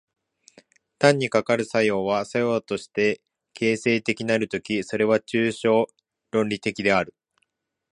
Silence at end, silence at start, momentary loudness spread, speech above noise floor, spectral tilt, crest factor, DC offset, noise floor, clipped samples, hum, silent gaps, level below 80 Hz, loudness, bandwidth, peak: 0.85 s; 1 s; 6 LU; 52 dB; -5 dB/octave; 24 dB; under 0.1%; -75 dBFS; under 0.1%; none; none; -62 dBFS; -23 LUFS; 11 kHz; 0 dBFS